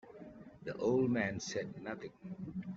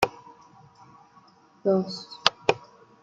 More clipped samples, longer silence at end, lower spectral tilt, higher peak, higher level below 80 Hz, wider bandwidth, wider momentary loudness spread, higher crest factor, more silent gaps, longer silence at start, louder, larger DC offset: neither; second, 0 s vs 0.45 s; first, -5.5 dB/octave vs -4 dB/octave; second, -20 dBFS vs -2 dBFS; second, -70 dBFS vs -64 dBFS; second, 7.8 kHz vs 16 kHz; first, 20 LU vs 10 LU; second, 18 dB vs 28 dB; neither; about the same, 0.05 s vs 0 s; second, -37 LUFS vs -26 LUFS; neither